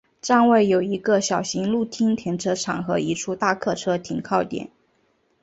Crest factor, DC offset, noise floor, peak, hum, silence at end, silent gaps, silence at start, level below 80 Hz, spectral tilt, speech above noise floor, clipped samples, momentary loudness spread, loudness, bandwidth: 18 dB; under 0.1%; -65 dBFS; -6 dBFS; none; 0.75 s; none; 0.25 s; -60 dBFS; -5 dB/octave; 44 dB; under 0.1%; 8 LU; -22 LUFS; 8 kHz